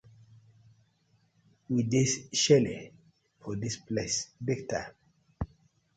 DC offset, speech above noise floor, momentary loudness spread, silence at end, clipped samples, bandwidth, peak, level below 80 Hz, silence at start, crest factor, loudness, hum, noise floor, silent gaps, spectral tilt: under 0.1%; 41 dB; 18 LU; 0.5 s; under 0.1%; 9.4 kHz; -10 dBFS; -56 dBFS; 1.7 s; 22 dB; -30 LUFS; none; -70 dBFS; none; -4.5 dB/octave